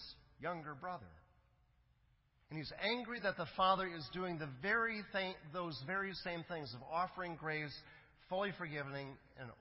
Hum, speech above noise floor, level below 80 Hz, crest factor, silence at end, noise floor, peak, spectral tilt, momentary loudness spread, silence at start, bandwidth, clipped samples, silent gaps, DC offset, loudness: none; 33 dB; -70 dBFS; 24 dB; 0 s; -75 dBFS; -20 dBFS; -2.5 dB/octave; 13 LU; 0 s; 5.6 kHz; under 0.1%; none; under 0.1%; -41 LUFS